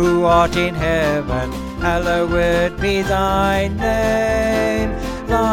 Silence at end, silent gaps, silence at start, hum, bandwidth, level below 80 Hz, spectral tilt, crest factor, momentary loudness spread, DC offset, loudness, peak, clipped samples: 0 s; none; 0 s; none; 16.5 kHz; -28 dBFS; -5.5 dB/octave; 14 dB; 8 LU; under 0.1%; -18 LUFS; -2 dBFS; under 0.1%